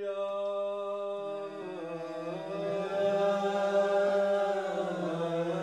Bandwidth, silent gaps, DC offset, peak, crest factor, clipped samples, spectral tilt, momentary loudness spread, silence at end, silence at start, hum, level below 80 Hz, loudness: 9.6 kHz; none; under 0.1%; -18 dBFS; 14 dB; under 0.1%; -6 dB/octave; 11 LU; 0 s; 0 s; none; -86 dBFS; -32 LUFS